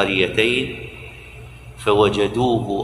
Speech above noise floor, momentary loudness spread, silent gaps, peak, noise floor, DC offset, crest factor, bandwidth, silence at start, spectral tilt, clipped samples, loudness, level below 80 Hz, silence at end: 20 dB; 22 LU; none; -2 dBFS; -39 dBFS; under 0.1%; 18 dB; 12.5 kHz; 0 s; -5.5 dB/octave; under 0.1%; -19 LUFS; -42 dBFS; 0 s